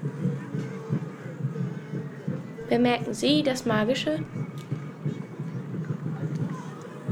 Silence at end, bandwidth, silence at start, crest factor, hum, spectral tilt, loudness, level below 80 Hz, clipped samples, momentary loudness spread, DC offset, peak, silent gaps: 0 s; 15.5 kHz; 0 s; 18 dB; none; -6 dB/octave; -29 LUFS; -64 dBFS; under 0.1%; 12 LU; under 0.1%; -10 dBFS; none